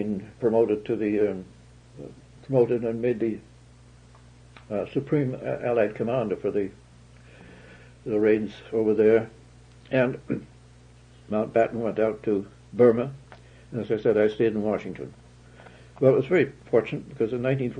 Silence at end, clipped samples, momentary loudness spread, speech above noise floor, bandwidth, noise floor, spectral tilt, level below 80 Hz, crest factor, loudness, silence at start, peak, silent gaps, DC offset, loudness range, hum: 0 s; under 0.1%; 15 LU; 27 dB; 9.4 kHz; -51 dBFS; -8.5 dB/octave; -58 dBFS; 20 dB; -25 LUFS; 0 s; -6 dBFS; none; under 0.1%; 4 LU; 60 Hz at -55 dBFS